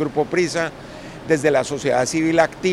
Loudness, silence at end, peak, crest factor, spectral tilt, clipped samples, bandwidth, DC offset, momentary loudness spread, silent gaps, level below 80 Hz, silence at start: -20 LUFS; 0 s; -2 dBFS; 18 dB; -4.5 dB/octave; under 0.1%; 13 kHz; under 0.1%; 15 LU; none; -50 dBFS; 0 s